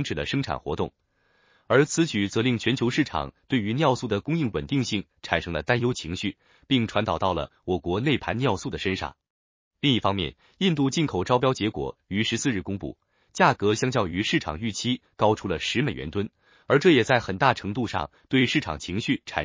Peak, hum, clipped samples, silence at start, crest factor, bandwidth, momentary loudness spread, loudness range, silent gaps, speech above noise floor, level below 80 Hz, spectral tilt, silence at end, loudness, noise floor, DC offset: -4 dBFS; none; under 0.1%; 0 s; 20 dB; 7.6 kHz; 9 LU; 3 LU; 9.30-9.71 s; 39 dB; -48 dBFS; -5 dB/octave; 0 s; -25 LUFS; -64 dBFS; under 0.1%